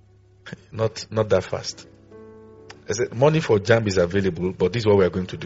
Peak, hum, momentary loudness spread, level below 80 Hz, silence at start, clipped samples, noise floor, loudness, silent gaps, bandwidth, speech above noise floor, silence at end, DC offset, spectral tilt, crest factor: -2 dBFS; none; 15 LU; -54 dBFS; 0.45 s; under 0.1%; -47 dBFS; -21 LUFS; none; 8 kHz; 26 dB; 0 s; under 0.1%; -5.5 dB/octave; 20 dB